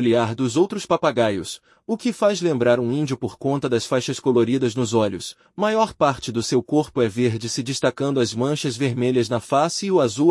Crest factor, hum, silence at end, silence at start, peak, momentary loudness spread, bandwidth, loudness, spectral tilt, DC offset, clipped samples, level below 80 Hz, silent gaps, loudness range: 18 dB; none; 0 s; 0 s; -4 dBFS; 6 LU; 12 kHz; -21 LUFS; -5.5 dB/octave; under 0.1%; under 0.1%; -60 dBFS; none; 1 LU